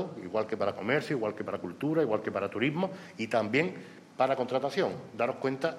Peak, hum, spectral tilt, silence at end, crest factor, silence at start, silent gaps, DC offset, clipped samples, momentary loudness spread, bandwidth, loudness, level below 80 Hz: -12 dBFS; none; -6.5 dB/octave; 0 s; 18 dB; 0 s; none; under 0.1%; under 0.1%; 7 LU; 13.5 kHz; -31 LUFS; -76 dBFS